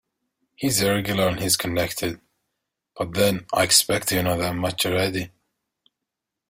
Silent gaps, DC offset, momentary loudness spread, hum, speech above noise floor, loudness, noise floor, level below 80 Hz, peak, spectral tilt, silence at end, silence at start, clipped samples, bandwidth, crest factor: none; under 0.1%; 13 LU; none; 62 dB; -22 LUFS; -84 dBFS; -52 dBFS; -4 dBFS; -3 dB/octave; 1.2 s; 0.6 s; under 0.1%; 16.5 kHz; 22 dB